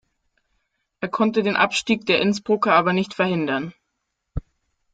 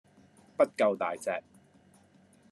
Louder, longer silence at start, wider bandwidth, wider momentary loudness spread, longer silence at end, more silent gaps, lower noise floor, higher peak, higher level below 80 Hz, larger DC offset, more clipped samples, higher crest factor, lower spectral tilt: first, -20 LUFS vs -30 LUFS; first, 1 s vs 0.6 s; second, 9.4 kHz vs 12.5 kHz; first, 18 LU vs 12 LU; second, 0.55 s vs 1.1 s; neither; first, -77 dBFS vs -62 dBFS; first, -4 dBFS vs -12 dBFS; first, -48 dBFS vs -84 dBFS; neither; neither; about the same, 18 dB vs 22 dB; about the same, -5 dB/octave vs -4.5 dB/octave